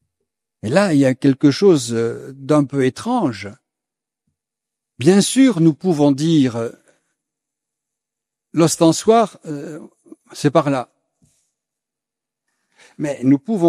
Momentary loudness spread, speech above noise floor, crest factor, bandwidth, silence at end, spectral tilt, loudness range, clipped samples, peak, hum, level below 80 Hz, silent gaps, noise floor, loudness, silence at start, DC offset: 16 LU; 69 dB; 18 dB; 14 kHz; 0 s; -6 dB/octave; 7 LU; under 0.1%; 0 dBFS; none; -62 dBFS; none; -85 dBFS; -16 LUFS; 0.65 s; under 0.1%